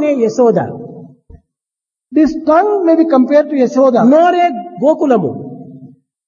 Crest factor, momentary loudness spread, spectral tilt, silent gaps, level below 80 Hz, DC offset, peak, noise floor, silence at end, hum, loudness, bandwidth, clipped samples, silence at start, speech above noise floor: 12 dB; 16 LU; -7 dB/octave; none; -50 dBFS; under 0.1%; 0 dBFS; -86 dBFS; 0.4 s; none; -11 LUFS; 7.2 kHz; under 0.1%; 0 s; 75 dB